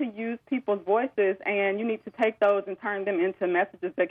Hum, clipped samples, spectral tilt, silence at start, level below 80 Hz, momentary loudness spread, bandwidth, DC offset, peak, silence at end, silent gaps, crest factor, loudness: none; under 0.1%; -7.5 dB/octave; 0 s; -78 dBFS; 7 LU; 4.8 kHz; under 0.1%; -12 dBFS; 0 s; none; 16 dB; -27 LUFS